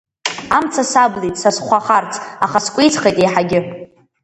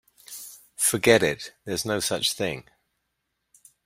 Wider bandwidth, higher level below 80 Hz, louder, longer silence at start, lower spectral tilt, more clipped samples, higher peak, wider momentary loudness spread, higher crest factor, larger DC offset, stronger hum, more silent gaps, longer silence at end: second, 11.5 kHz vs 16 kHz; first, -52 dBFS vs -60 dBFS; first, -15 LUFS vs -24 LUFS; about the same, 0.25 s vs 0.3 s; about the same, -3.5 dB/octave vs -2.5 dB/octave; neither; about the same, 0 dBFS vs -2 dBFS; second, 10 LU vs 20 LU; second, 16 dB vs 24 dB; neither; neither; neither; second, 0.4 s vs 1.25 s